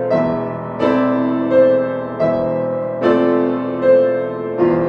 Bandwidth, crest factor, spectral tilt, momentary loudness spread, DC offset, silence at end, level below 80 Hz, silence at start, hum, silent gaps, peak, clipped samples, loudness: 5.8 kHz; 14 dB; -9 dB/octave; 8 LU; under 0.1%; 0 s; -52 dBFS; 0 s; none; none; -2 dBFS; under 0.1%; -16 LUFS